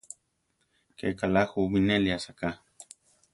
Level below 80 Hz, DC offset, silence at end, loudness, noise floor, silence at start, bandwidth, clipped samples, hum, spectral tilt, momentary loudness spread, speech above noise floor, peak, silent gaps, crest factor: -52 dBFS; under 0.1%; 0.5 s; -28 LUFS; -75 dBFS; 1 s; 11.5 kHz; under 0.1%; none; -6 dB/octave; 24 LU; 48 dB; -10 dBFS; none; 20 dB